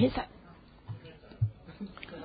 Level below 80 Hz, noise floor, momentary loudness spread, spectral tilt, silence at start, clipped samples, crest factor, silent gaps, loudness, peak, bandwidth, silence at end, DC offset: -54 dBFS; -54 dBFS; 18 LU; -6.5 dB/octave; 0 s; under 0.1%; 22 dB; none; -38 LUFS; -14 dBFS; 4.9 kHz; 0 s; under 0.1%